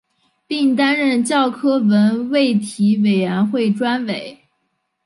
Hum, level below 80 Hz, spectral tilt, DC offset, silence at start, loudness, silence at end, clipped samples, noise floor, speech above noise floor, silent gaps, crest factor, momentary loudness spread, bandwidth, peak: none; -68 dBFS; -5.5 dB/octave; under 0.1%; 0.5 s; -17 LUFS; 0.7 s; under 0.1%; -71 dBFS; 54 dB; none; 14 dB; 7 LU; 11.5 kHz; -2 dBFS